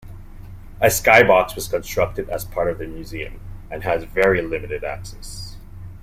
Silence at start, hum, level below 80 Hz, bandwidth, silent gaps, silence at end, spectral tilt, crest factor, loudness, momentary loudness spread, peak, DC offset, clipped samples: 0 s; none; -36 dBFS; 16.5 kHz; none; 0 s; -4 dB/octave; 20 dB; -19 LUFS; 22 LU; 0 dBFS; under 0.1%; under 0.1%